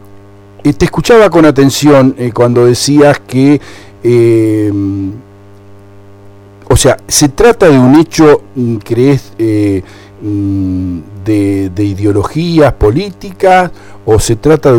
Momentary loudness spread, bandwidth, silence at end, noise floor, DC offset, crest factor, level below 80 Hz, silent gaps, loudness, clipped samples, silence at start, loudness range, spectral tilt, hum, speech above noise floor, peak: 10 LU; 18.5 kHz; 0 s; -35 dBFS; under 0.1%; 8 dB; -28 dBFS; none; -9 LUFS; 0.9%; 0.15 s; 6 LU; -5.5 dB/octave; 50 Hz at -40 dBFS; 27 dB; 0 dBFS